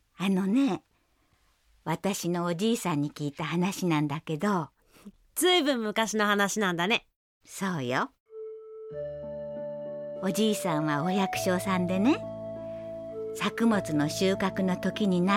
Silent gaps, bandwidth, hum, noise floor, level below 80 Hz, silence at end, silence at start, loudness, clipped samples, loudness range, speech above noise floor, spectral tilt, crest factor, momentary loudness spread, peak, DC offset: 7.16-7.41 s, 8.20-8.26 s; 16.5 kHz; none; -68 dBFS; -62 dBFS; 0 s; 0.2 s; -28 LUFS; under 0.1%; 5 LU; 41 dB; -5 dB/octave; 18 dB; 13 LU; -12 dBFS; under 0.1%